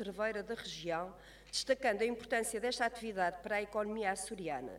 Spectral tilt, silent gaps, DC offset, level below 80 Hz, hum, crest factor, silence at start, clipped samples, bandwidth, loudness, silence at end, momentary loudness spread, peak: -3 dB/octave; none; under 0.1%; -64 dBFS; none; 18 dB; 0 s; under 0.1%; 16.5 kHz; -37 LUFS; 0 s; 8 LU; -18 dBFS